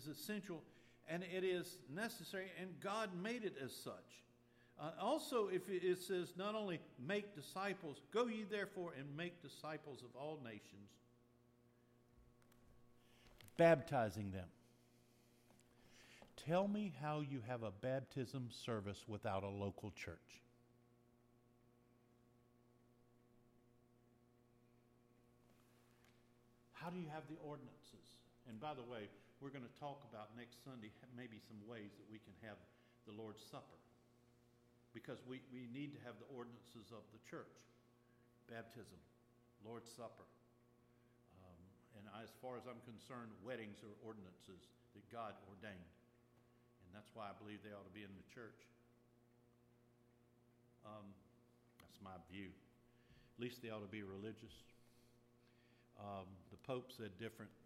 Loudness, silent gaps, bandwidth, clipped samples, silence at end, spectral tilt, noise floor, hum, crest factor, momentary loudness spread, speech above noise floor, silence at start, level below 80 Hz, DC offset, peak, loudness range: -48 LUFS; none; 15.5 kHz; under 0.1%; 0 s; -5.5 dB/octave; -74 dBFS; none; 26 dB; 21 LU; 26 dB; 0 s; -84 dBFS; under 0.1%; -24 dBFS; 18 LU